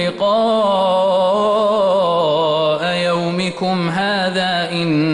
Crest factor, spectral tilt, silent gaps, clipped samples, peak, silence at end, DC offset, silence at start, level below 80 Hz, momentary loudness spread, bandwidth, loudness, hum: 10 dB; -5.5 dB/octave; none; under 0.1%; -6 dBFS; 0 s; under 0.1%; 0 s; -56 dBFS; 3 LU; 11.5 kHz; -16 LUFS; none